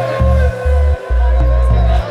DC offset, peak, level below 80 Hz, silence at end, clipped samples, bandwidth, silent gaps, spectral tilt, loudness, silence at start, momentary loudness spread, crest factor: under 0.1%; -2 dBFS; -12 dBFS; 0 s; under 0.1%; 5.8 kHz; none; -8 dB/octave; -14 LUFS; 0 s; 2 LU; 10 dB